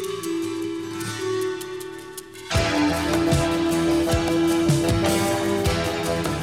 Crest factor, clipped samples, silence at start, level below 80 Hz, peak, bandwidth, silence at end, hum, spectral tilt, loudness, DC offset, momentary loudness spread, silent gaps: 16 dB; under 0.1%; 0 s; -38 dBFS; -8 dBFS; 16.5 kHz; 0 s; none; -5 dB/octave; -23 LUFS; 0.1%; 11 LU; none